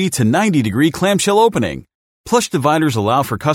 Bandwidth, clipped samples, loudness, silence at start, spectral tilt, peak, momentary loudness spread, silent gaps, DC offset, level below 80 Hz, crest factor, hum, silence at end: 16.5 kHz; under 0.1%; -15 LUFS; 0 s; -5 dB/octave; 0 dBFS; 5 LU; 1.95-2.24 s; under 0.1%; -48 dBFS; 14 dB; none; 0 s